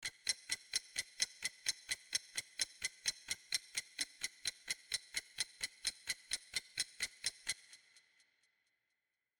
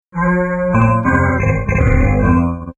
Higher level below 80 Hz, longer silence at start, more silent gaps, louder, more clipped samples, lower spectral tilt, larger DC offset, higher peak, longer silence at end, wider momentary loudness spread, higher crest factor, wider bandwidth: second, -76 dBFS vs -22 dBFS; second, 0 s vs 0.15 s; neither; second, -41 LUFS vs -14 LUFS; neither; second, 2.5 dB/octave vs -10 dB/octave; neither; second, -18 dBFS vs 0 dBFS; first, 1.65 s vs 0.05 s; about the same, 5 LU vs 3 LU; first, 26 dB vs 14 dB; first, 19.5 kHz vs 7.8 kHz